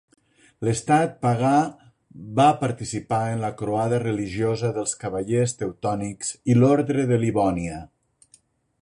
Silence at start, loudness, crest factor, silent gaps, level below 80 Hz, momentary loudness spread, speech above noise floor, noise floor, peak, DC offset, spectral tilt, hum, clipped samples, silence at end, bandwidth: 0.6 s; -23 LUFS; 18 dB; none; -52 dBFS; 10 LU; 37 dB; -60 dBFS; -6 dBFS; under 0.1%; -6 dB/octave; none; under 0.1%; 0.95 s; 11.5 kHz